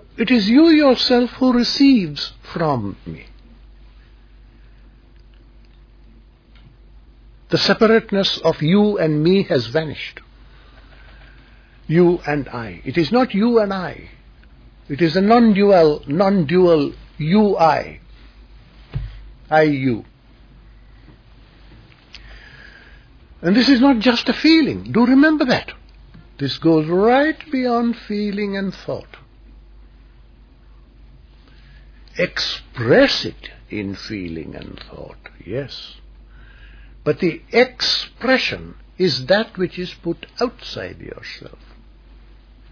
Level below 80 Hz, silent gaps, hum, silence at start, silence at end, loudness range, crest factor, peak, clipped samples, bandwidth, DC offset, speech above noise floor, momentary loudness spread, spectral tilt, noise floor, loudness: -44 dBFS; none; none; 0.15 s; 1.25 s; 13 LU; 18 dB; -2 dBFS; under 0.1%; 5.4 kHz; under 0.1%; 30 dB; 18 LU; -6.5 dB/octave; -47 dBFS; -17 LUFS